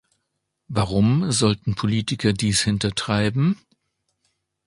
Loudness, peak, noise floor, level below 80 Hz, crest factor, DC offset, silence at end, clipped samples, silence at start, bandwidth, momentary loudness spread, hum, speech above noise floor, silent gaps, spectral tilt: -21 LUFS; -4 dBFS; -77 dBFS; -46 dBFS; 18 dB; under 0.1%; 1.1 s; under 0.1%; 0.7 s; 11.5 kHz; 5 LU; none; 56 dB; none; -5 dB/octave